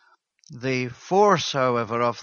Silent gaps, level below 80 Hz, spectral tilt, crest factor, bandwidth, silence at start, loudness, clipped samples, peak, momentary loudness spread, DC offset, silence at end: none; -64 dBFS; -5 dB/octave; 18 dB; 7.2 kHz; 0.5 s; -22 LUFS; under 0.1%; -4 dBFS; 9 LU; under 0.1%; 0 s